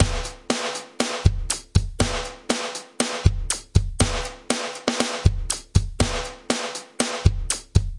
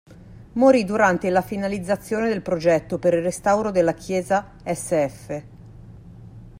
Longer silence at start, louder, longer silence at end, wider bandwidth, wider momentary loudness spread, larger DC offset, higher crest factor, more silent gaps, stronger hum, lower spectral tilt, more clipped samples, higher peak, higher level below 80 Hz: about the same, 0 s vs 0.1 s; second, -24 LUFS vs -21 LUFS; about the same, 0 s vs 0 s; second, 11.5 kHz vs 16 kHz; second, 6 LU vs 11 LU; neither; about the same, 22 dB vs 18 dB; neither; neither; second, -4 dB/octave vs -6 dB/octave; neither; first, 0 dBFS vs -4 dBFS; first, -30 dBFS vs -50 dBFS